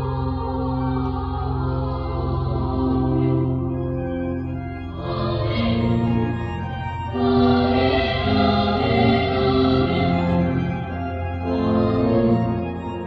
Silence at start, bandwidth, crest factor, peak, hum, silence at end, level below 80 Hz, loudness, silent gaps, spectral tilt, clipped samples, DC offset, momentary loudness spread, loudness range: 0 s; 5.8 kHz; 14 dB; -6 dBFS; none; 0 s; -34 dBFS; -21 LUFS; none; -9.5 dB/octave; under 0.1%; under 0.1%; 9 LU; 5 LU